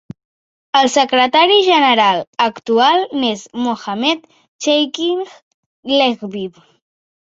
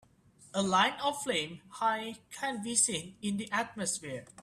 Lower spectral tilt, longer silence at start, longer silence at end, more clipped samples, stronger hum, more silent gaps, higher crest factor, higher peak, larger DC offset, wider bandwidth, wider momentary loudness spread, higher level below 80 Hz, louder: about the same, -3 dB/octave vs -2.5 dB/octave; first, 0.75 s vs 0.4 s; first, 0.8 s vs 0 s; neither; neither; first, 2.27-2.33 s, 4.48-4.59 s, 5.42-5.83 s vs none; second, 16 dB vs 22 dB; first, 0 dBFS vs -12 dBFS; neither; second, 8 kHz vs 14.5 kHz; about the same, 13 LU vs 11 LU; first, -64 dBFS vs -70 dBFS; first, -14 LUFS vs -32 LUFS